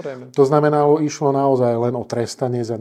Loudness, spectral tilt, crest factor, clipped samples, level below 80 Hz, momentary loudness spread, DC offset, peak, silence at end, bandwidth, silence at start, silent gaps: -18 LUFS; -7 dB/octave; 18 dB; under 0.1%; -64 dBFS; 8 LU; under 0.1%; 0 dBFS; 0 s; 11.5 kHz; 0 s; none